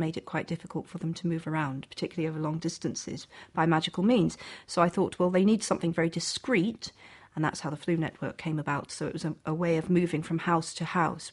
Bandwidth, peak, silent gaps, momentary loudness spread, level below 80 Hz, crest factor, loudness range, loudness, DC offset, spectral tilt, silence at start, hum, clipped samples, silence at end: 11.5 kHz; -10 dBFS; none; 10 LU; -62 dBFS; 20 dB; 6 LU; -30 LUFS; under 0.1%; -5.5 dB/octave; 0 s; none; under 0.1%; 0 s